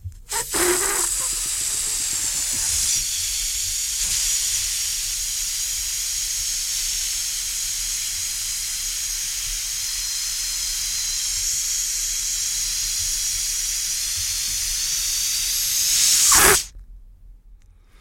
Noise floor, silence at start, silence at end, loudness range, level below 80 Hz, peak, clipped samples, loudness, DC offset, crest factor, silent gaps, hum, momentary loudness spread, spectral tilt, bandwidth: -48 dBFS; 0 s; 0.05 s; 5 LU; -42 dBFS; 0 dBFS; under 0.1%; -20 LUFS; under 0.1%; 24 dB; none; none; 6 LU; 0.5 dB/octave; 16.5 kHz